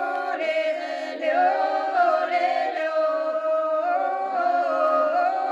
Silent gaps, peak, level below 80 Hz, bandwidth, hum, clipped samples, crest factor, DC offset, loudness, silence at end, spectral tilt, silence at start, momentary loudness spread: none; -10 dBFS; -88 dBFS; 8.4 kHz; none; under 0.1%; 12 dB; under 0.1%; -23 LUFS; 0 s; -2.5 dB/octave; 0 s; 5 LU